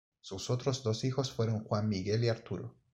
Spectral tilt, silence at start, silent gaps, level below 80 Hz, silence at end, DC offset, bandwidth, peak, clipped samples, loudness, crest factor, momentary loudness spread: -6 dB/octave; 0.25 s; none; -66 dBFS; 0.25 s; under 0.1%; 8.4 kHz; -18 dBFS; under 0.1%; -34 LUFS; 16 dB; 10 LU